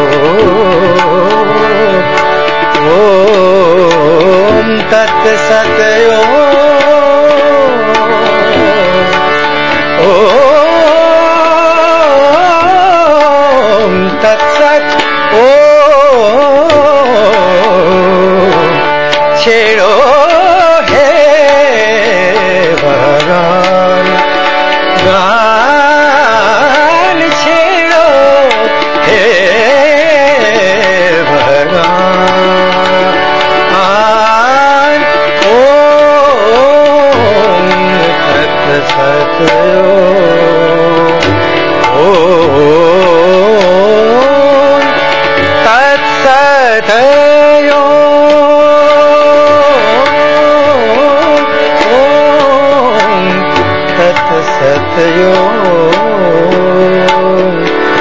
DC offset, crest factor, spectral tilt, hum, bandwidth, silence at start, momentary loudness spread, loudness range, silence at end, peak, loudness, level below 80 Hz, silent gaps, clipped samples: 8%; 6 dB; -4.5 dB/octave; none; 8 kHz; 0 s; 4 LU; 2 LU; 0 s; 0 dBFS; -6 LUFS; -40 dBFS; none; 3%